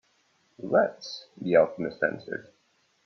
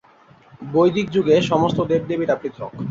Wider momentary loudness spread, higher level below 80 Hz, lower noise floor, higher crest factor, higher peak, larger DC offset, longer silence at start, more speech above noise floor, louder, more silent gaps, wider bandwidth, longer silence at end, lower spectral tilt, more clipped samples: first, 16 LU vs 12 LU; second, -70 dBFS vs -54 dBFS; first, -68 dBFS vs -51 dBFS; first, 22 dB vs 16 dB; second, -8 dBFS vs -4 dBFS; neither; about the same, 0.6 s vs 0.6 s; first, 41 dB vs 32 dB; second, -26 LUFS vs -19 LUFS; neither; second, 6.6 kHz vs 7.8 kHz; first, 0.65 s vs 0 s; about the same, -6 dB/octave vs -7 dB/octave; neither